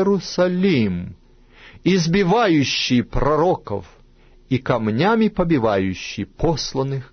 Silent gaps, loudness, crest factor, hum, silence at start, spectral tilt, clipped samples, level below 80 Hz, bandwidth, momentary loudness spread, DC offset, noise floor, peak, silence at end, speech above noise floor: none; -19 LUFS; 16 dB; none; 0 s; -6 dB/octave; under 0.1%; -36 dBFS; 6.6 kHz; 9 LU; under 0.1%; -49 dBFS; -4 dBFS; 0.05 s; 30 dB